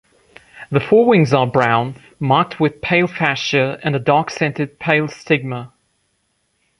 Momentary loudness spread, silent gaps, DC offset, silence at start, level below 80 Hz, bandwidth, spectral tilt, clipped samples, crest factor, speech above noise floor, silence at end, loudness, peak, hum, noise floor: 8 LU; none; under 0.1%; 0.55 s; -54 dBFS; 11 kHz; -6.5 dB/octave; under 0.1%; 18 dB; 50 dB; 1.15 s; -17 LUFS; 0 dBFS; none; -66 dBFS